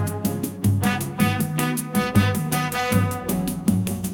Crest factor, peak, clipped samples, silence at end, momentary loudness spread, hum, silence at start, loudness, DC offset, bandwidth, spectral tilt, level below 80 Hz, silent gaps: 18 dB; -4 dBFS; under 0.1%; 0 s; 5 LU; none; 0 s; -23 LUFS; under 0.1%; 18 kHz; -5.5 dB/octave; -46 dBFS; none